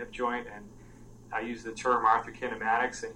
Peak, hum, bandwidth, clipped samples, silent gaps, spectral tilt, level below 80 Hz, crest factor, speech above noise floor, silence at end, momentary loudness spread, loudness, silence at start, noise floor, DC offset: -10 dBFS; none; 16 kHz; under 0.1%; none; -4 dB/octave; -56 dBFS; 22 dB; 20 dB; 0 s; 12 LU; -30 LUFS; 0 s; -51 dBFS; under 0.1%